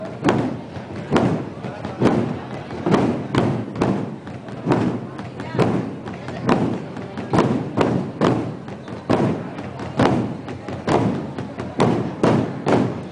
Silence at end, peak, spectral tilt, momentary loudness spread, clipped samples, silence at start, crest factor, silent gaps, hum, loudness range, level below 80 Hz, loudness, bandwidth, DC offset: 0 s; -2 dBFS; -7.5 dB/octave; 12 LU; under 0.1%; 0 s; 18 dB; none; none; 2 LU; -48 dBFS; -22 LUFS; 10 kHz; under 0.1%